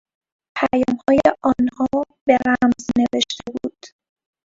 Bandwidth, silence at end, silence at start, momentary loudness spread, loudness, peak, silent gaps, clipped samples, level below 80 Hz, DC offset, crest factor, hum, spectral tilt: 7.8 kHz; 0.6 s; 0.55 s; 12 LU; -19 LUFS; 0 dBFS; 2.21-2.26 s; under 0.1%; -50 dBFS; under 0.1%; 20 dB; none; -4.5 dB/octave